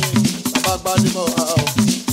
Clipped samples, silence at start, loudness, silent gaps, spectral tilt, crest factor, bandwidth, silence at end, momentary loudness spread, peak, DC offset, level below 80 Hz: under 0.1%; 0 s; -17 LUFS; none; -4 dB/octave; 16 dB; 16.5 kHz; 0 s; 2 LU; -2 dBFS; under 0.1%; -42 dBFS